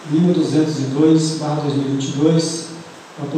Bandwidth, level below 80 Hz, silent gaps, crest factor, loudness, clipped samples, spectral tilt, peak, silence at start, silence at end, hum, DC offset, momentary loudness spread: 9.6 kHz; -68 dBFS; none; 14 dB; -17 LUFS; under 0.1%; -6 dB/octave; -4 dBFS; 0 s; 0 s; none; under 0.1%; 16 LU